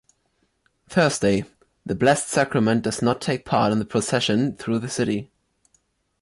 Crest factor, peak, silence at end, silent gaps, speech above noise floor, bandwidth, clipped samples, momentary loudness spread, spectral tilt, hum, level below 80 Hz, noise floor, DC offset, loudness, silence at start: 16 dB; -6 dBFS; 1 s; none; 48 dB; 11.5 kHz; under 0.1%; 7 LU; -5 dB/octave; none; -54 dBFS; -69 dBFS; under 0.1%; -22 LUFS; 0.9 s